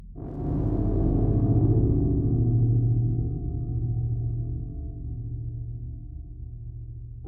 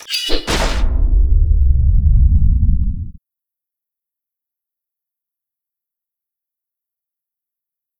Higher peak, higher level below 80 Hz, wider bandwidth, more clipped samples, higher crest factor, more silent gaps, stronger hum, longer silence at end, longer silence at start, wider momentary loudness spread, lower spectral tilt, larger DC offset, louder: second, -10 dBFS vs 0 dBFS; second, -32 dBFS vs -18 dBFS; second, 1.6 kHz vs 17.5 kHz; neither; about the same, 16 dB vs 16 dB; neither; neither; second, 0 s vs 4.9 s; about the same, 0 s vs 0.1 s; first, 17 LU vs 7 LU; first, -14.5 dB/octave vs -5 dB/octave; neither; second, -26 LUFS vs -16 LUFS